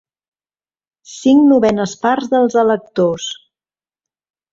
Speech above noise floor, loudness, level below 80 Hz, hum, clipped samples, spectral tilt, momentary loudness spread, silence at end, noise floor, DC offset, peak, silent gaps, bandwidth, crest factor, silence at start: over 76 dB; -14 LUFS; -56 dBFS; none; under 0.1%; -5.5 dB/octave; 12 LU; 1.2 s; under -90 dBFS; under 0.1%; -2 dBFS; none; 7.8 kHz; 14 dB; 1.1 s